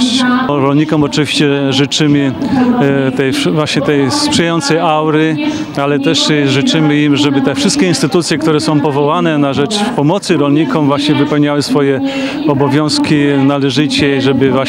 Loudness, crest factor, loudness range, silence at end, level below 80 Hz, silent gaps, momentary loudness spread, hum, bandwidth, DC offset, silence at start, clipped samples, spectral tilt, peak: -11 LUFS; 10 dB; 1 LU; 0 s; -48 dBFS; none; 3 LU; none; 13 kHz; under 0.1%; 0 s; under 0.1%; -5 dB/octave; 0 dBFS